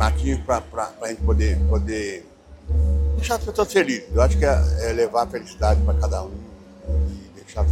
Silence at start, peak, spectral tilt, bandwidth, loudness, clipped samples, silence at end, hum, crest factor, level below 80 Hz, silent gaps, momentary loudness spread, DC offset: 0 s; -4 dBFS; -6 dB/octave; 13.5 kHz; -22 LUFS; under 0.1%; 0 s; none; 18 dB; -24 dBFS; none; 11 LU; under 0.1%